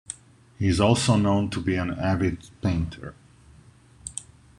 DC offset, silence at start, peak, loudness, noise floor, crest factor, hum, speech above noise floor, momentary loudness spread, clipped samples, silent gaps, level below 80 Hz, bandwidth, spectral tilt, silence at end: under 0.1%; 0.1 s; -6 dBFS; -24 LUFS; -53 dBFS; 20 dB; none; 29 dB; 19 LU; under 0.1%; none; -44 dBFS; 11.5 kHz; -5.5 dB/octave; 0.35 s